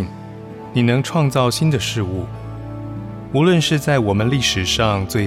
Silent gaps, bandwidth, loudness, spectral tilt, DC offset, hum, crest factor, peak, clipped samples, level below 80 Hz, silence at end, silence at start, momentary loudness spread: none; 15.5 kHz; -17 LUFS; -5 dB/octave; under 0.1%; none; 16 dB; -2 dBFS; under 0.1%; -40 dBFS; 0 s; 0 s; 15 LU